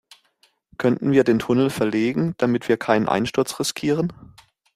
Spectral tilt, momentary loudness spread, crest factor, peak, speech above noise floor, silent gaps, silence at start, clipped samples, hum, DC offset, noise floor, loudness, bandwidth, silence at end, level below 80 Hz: -5.5 dB/octave; 6 LU; 18 dB; -2 dBFS; 43 dB; none; 0.8 s; under 0.1%; none; under 0.1%; -63 dBFS; -21 LUFS; 15.5 kHz; 0.5 s; -56 dBFS